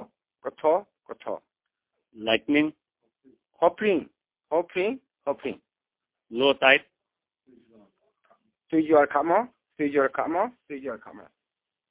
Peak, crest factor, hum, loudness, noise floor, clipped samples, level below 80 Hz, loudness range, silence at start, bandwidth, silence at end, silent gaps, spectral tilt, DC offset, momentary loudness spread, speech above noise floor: -4 dBFS; 24 dB; none; -25 LUFS; -89 dBFS; under 0.1%; -70 dBFS; 4 LU; 0 s; 4 kHz; 0.7 s; none; -8 dB/octave; under 0.1%; 17 LU; 65 dB